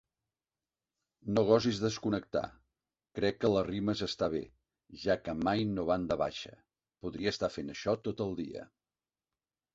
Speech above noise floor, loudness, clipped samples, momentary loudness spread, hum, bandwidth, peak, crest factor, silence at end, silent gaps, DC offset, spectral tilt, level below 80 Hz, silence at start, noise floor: over 58 dB; -33 LUFS; under 0.1%; 16 LU; none; 7.8 kHz; -12 dBFS; 22 dB; 1.1 s; none; under 0.1%; -6 dB/octave; -60 dBFS; 1.25 s; under -90 dBFS